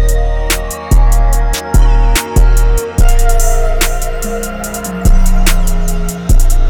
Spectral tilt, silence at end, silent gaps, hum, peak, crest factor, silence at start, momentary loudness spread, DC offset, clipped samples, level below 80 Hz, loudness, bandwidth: -4.5 dB/octave; 0 s; none; none; 0 dBFS; 8 dB; 0 s; 7 LU; under 0.1%; under 0.1%; -8 dBFS; -14 LUFS; 18 kHz